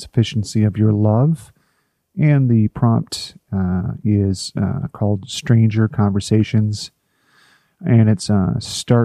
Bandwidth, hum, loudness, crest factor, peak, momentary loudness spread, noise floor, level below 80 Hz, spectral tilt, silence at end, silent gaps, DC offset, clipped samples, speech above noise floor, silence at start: 12 kHz; none; -18 LUFS; 16 dB; -2 dBFS; 10 LU; -66 dBFS; -48 dBFS; -7 dB/octave; 0 s; none; under 0.1%; under 0.1%; 50 dB; 0 s